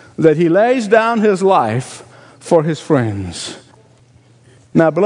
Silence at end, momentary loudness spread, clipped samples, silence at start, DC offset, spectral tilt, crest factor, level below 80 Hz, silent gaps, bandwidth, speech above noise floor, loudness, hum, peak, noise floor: 0 s; 15 LU; 0.1%; 0.2 s; under 0.1%; -6.5 dB/octave; 16 dB; -58 dBFS; none; 11 kHz; 35 dB; -14 LUFS; none; 0 dBFS; -48 dBFS